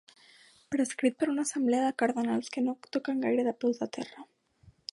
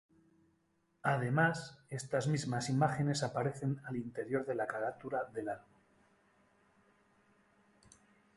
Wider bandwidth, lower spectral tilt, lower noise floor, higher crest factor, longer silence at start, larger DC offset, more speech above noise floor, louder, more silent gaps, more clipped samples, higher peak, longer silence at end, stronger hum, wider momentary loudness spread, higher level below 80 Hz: about the same, 11.5 kHz vs 11.5 kHz; second, -4 dB/octave vs -6 dB/octave; second, -62 dBFS vs -76 dBFS; about the same, 18 dB vs 22 dB; second, 0.7 s vs 1.05 s; neither; second, 32 dB vs 41 dB; first, -30 LUFS vs -36 LUFS; neither; neither; about the same, -14 dBFS vs -16 dBFS; second, 0.7 s vs 2.75 s; neither; about the same, 8 LU vs 10 LU; about the same, -76 dBFS vs -72 dBFS